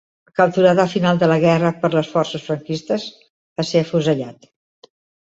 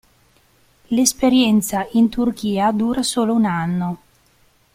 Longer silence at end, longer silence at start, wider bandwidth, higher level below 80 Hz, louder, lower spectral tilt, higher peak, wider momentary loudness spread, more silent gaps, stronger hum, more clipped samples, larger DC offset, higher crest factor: first, 1 s vs 0.8 s; second, 0.4 s vs 0.9 s; second, 8 kHz vs 16 kHz; second, -60 dBFS vs -50 dBFS; about the same, -18 LUFS vs -18 LUFS; first, -6.5 dB/octave vs -4.5 dB/octave; about the same, -2 dBFS vs -2 dBFS; first, 11 LU vs 8 LU; first, 3.30-3.56 s vs none; neither; neither; neither; about the same, 16 dB vs 18 dB